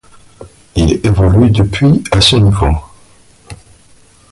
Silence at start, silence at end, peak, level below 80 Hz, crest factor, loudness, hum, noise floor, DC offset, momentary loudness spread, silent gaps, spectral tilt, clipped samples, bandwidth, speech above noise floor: 0.4 s; 0.75 s; 0 dBFS; -22 dBFS; 12 dB; -11 LUFS; none; -44 dBFS; under 0.1%; 7 LU; none; -6 dB/octave; under 0.1%; 11.5 kHz; 35 dB